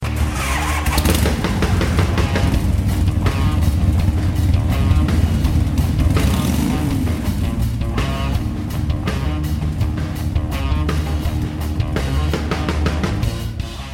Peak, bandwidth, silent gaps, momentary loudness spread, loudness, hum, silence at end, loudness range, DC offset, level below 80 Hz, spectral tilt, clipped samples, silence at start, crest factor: -2 dBFS; 17 kHz; none; 5 LU; -19 LUFS; none; 0 s; 4 LU; under 0.1%; -22 dBFS; -6 dB/octave; under 0.1%; 0 s; 16 dB